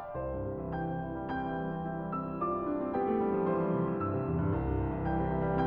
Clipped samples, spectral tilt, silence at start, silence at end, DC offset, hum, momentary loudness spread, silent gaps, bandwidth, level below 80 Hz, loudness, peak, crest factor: under 0.1%; -11.5 dB/octave; 0 s; 0 s; under 0.1%; none; 6 LU; none; 5.2 kHz; -46 dBFS; -33 LUFS; -18 dBFS; 14 dB